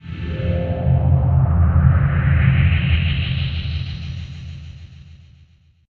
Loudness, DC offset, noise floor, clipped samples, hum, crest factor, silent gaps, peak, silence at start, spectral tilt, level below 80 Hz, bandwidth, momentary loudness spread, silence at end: -18 LUFS; under 0.1%; -52 dBFS; under 0.1%; none; 16 dB; none; -2 dBFS; 0.05 s; -9 dB/octave; -26 dBFS; 4.7 kHz; 17 LU; 0.8 s